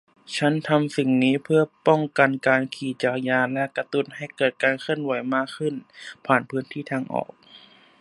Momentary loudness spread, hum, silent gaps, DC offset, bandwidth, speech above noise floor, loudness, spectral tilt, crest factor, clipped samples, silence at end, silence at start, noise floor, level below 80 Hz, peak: 10 LU; none; none; under 0.1%; 11.5 kHz; 28 dB; -23 LUFS; -6 dB/octave; 22 dB; under 0.1%; 0.4 s; 0.3 s; -51 dBFS; -72 dBFS; -2 dBFS